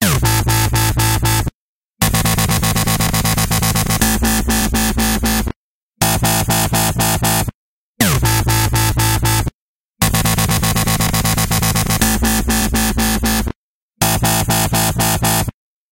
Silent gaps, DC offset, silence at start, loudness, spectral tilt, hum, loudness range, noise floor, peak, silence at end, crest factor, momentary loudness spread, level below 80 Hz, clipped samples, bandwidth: 1.54-1.94 s, 5.56-5.91 s, 7.55-7.95 s, 9.54-9.93 s, 13.56-13.91 s; under 0.1%; 0 s; -15 LUFS; -3.5 dB/octave; none; 1 LU; -61 dBFS; -2 dBFS; 0.4 s; 14 dB; 4 LU; -24 dBFS; under 0.1%; 17 kHz